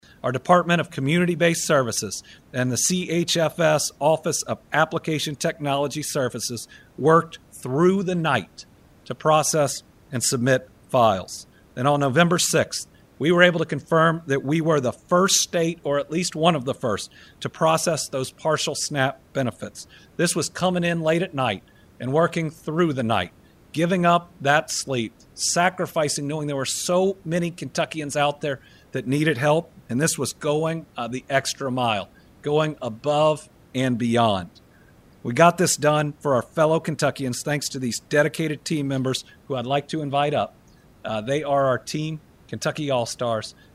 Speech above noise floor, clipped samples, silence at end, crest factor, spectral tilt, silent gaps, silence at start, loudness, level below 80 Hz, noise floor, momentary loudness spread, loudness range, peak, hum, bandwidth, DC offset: 30 dB; under 0.1%; 0.25 s; 20 dB; -4 dB/octave; none; 0.25 s; -22 LUFS; -58 dBFS; -52 dBFS; 12 LU; 4 LU; -2 dBFS; none; 16 kHz; under 0.1%